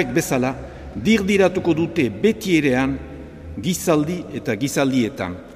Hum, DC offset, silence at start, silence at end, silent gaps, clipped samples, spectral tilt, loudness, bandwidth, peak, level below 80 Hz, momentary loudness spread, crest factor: none; under 0.1%; 0 s; 0 s; none; under 0.1%; -5.5 dB/octave; -20 LUFS; 15.5 kHz; -4 dBFS; -42 dBFS; 13 LU; 16 dB